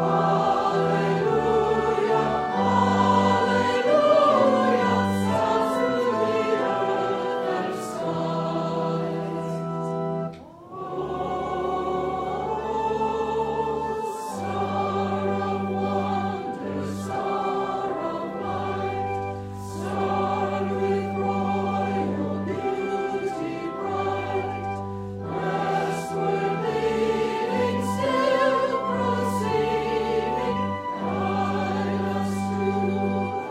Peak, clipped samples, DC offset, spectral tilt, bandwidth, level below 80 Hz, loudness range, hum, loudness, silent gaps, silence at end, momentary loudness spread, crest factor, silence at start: -8 dBFS; under 0.1%; under 0.1%; -6.5 dB/octave; 15 kHz; -54 dBFS; 8 LU; none; -25 LUFS; none; 0 s; 9 LU; 16 dB; 0 s